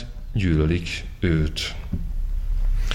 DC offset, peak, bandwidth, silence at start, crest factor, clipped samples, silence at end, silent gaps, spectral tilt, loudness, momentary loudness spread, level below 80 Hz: under 0.1%; -6 dBFS; 11.5 kHz; 0 s; 16 dB; under 0.1%; 0 s; none; -6 dB/octave; -25 LUFS; 10 LU; -26 dBFS